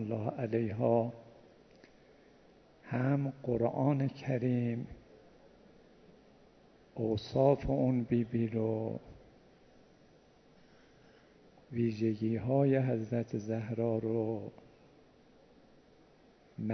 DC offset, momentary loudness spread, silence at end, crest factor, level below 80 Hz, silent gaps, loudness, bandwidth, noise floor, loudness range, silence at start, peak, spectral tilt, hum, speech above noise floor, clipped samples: under 0.1%; 12 LU; 0 s; 22 dB; -60 dBFS; none; -33 LUFS; 6.4 kHz; -63 dBFS; 6 LU; 0 s; -14 dBFS; -9.5 dB/octave; none; 31 dB; under 0.1%